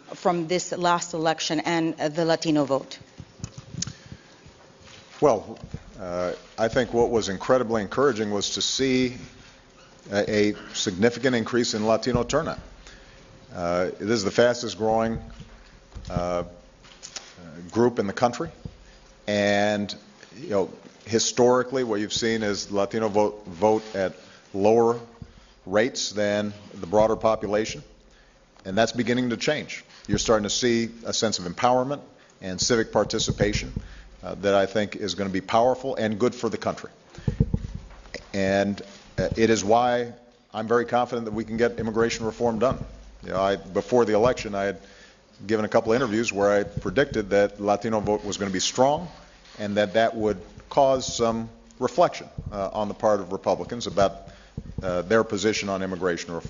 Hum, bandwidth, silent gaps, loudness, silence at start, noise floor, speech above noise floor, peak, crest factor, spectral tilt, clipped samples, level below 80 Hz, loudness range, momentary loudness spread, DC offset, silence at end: none; 7.8 kHz; none; -24 LUFS; 0.1 s; -55 dBFS; 31 dB; -4 dBFS; 22 dB; -4.5 dB/octave; under 0.1%; -48 dBFS; 4 LU; 17 LU; under 0.1%; 0 s